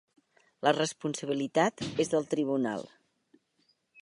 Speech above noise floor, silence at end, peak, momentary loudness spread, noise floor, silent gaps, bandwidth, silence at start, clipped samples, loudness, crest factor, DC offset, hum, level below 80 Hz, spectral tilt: 43 dB; 1.15 s; -8 dBFS; 7 LU; -73 dBFS; none; 11.5 kHz; 0.6 s; under 0.1%; -30 LUFS; 22 dB; under 0.1%; none; -74 dBFS; -4.5 dB/octave